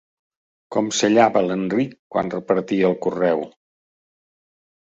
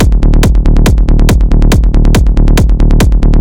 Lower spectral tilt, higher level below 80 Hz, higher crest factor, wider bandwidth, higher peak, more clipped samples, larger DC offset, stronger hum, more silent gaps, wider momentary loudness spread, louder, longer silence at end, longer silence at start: second, -5 dB/octave vs -6.5 dB/octave; second, -62 dBFS vs -6 dBFS; first, 20 dB vs 6 dB; second, 8.2 kHz vs 15.5 kHz; about the same, -2 dBFS vs 0 dBFS; second, under 0.1% vs 0.1%; neither; neither; first, 1.99-2.10 s vs none; first, 10 LU vs 0 LU; second, -20 LUFS vs -9 LUFS; first, 1.4 s vs 0 s; first, 0.7 s vs 0 s